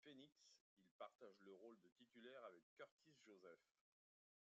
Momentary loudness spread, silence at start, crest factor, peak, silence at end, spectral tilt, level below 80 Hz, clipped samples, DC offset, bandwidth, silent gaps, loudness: 6 LU; 0 s; 22 dB; -44 dBFS; 0.85 s; -2.5 dB/octave; under -90 dBFS; under 0.1%; under 0.1%; 7.4 kHz; 0.61-0.77 s, 0.91-0.99 s, 1.15-1.19 s, 1.92-1.96 s, 2.63-2.77 s, 2.91-2.99 s; -65 LUFS